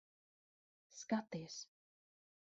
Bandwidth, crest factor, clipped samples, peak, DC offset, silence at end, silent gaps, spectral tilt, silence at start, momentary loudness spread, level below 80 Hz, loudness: 8 kHz; 24 dB; under 0.1%; -26 dBFS; under 0.1%; 0.8 s; none; -4.5 dB/octave; 0.9 s; 17 LU; -88 dBFS; -45 LUFS